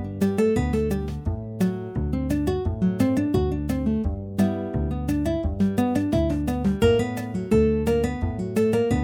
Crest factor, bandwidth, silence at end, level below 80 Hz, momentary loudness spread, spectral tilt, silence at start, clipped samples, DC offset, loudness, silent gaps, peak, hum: 16 dB; 18 kHz; 0 s; -34 dBFS; 7 LU; -7.5 dB/octave; 0 s; under 0.1%; under 0.1%; -24 LUFS; none; -6 dBFS; none